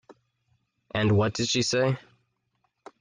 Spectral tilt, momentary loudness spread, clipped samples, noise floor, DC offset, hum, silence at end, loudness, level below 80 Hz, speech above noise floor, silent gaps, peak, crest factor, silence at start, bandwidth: -4.5 dB/octave; 8 LU; under 0.1%; -75 dBFS; under 0.1%; none; 1 s; -25 LUFS; -60 dBFS; 51 dB; none; -12 dBFS; 18 dB; 0.1 s; 9.8 kHz